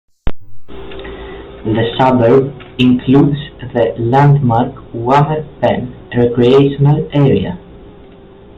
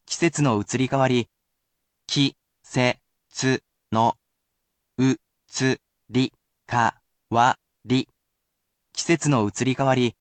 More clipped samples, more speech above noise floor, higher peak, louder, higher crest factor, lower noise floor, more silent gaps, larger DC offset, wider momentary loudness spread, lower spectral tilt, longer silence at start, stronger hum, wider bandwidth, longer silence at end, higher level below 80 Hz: neither; second, 26 dB vs 56 dB; first, 0 dBFS vs -6 dBFS; first, -12 LUFS vs -24 LUFS; second, 12 dB vs 18 dB; second, -38 dBFS vs -78 dBFS; neither; neither; first, 19 LU vs 11 LU; first, -9 dB/octave vs -5 dB/octave; first, 0.25 s vs 0.1 s; neither; second, 5.6 kHz vs 9.2 kHz; first, 0.7 s vs 0.1 s; first, -36 dBFS vs -60 dBFS